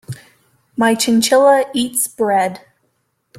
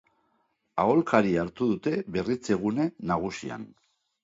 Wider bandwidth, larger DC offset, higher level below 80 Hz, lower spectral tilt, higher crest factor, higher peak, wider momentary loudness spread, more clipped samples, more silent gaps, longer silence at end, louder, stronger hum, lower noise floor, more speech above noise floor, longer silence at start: first, 16.5 kHz vs 7.8 kHz; neither; about the same, -60 dBFS vs -58 dBFS; second, -3 dB/octave vs -7 dB/octave; second, 14 dB vs 22 dB; first, -2 dBFS vs -6 dBFS; first, 17 LU vs 13 LU; neither; neither; first, 0.8 s vs 0.55 s; first, -15 LUFS vs -27 LUFS; neither; second, -66 dBFS vs -73 dBFS; first, 52 dB vs 46 dB; second, 0.1 s vs 0.75 s